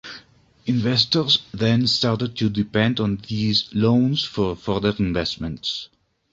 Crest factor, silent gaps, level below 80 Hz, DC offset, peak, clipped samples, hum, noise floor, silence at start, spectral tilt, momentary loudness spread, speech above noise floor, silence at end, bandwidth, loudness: 20 dB; none; -46 dBFS; under 0.1%; -2 dBFS; under 0.1%; none; -52 dBFS; 0.05 s; -6 dB/octave; 9 LU; 31 dB; 0.45 s; 7.8 kHz; -21 LUFS